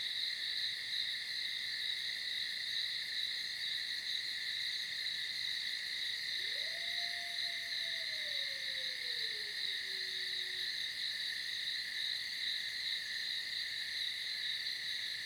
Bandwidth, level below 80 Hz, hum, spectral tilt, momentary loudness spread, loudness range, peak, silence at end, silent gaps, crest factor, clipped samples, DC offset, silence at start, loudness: over 20 kHz; -80 dBFS; none; 1.5 dB/octave; 1 LU; 0 LU; -24 dBFS; 0 s; none; 16 dB; under 0.1%; under 0.1%; 0 s; -37 LUFS